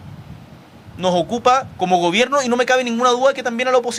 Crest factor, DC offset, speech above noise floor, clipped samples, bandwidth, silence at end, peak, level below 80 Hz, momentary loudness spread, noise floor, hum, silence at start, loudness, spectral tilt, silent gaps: 16 dB; under 0.1%; 25 dB; under 0.1%; 12.5 kHz; 0 s; -2 dBFS; -54 dBFS; 5 LU; -41 dBFS; none; 0 s; -17 LUFS; -4 dB/octave; none